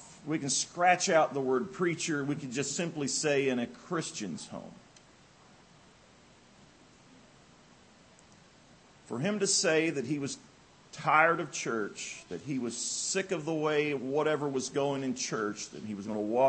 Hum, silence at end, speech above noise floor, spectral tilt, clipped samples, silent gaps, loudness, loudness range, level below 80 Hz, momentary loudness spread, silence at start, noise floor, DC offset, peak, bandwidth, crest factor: none; 0 s; 28 dB; -3.5 dB/octave; under 0.1%; none; -31 LUFS; 11 LU; -74 dBFS; 14 LU; 0 s; -59 dBFS; under 0.1%; -10 dBFS; 8.8 kHz; 24 dB